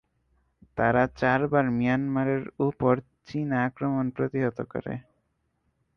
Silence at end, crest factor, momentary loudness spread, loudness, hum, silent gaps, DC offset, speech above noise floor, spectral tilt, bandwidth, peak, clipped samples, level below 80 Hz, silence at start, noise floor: 0.95 s; 18 dB; 11 LU; -26 LUFS; none; none; under 0.1%; 48 dB; -9 dB/octave; 6.4 kHz; -8 dBFS; under 0.1%; -56 dBFS; 0.75 s; -74 dBFS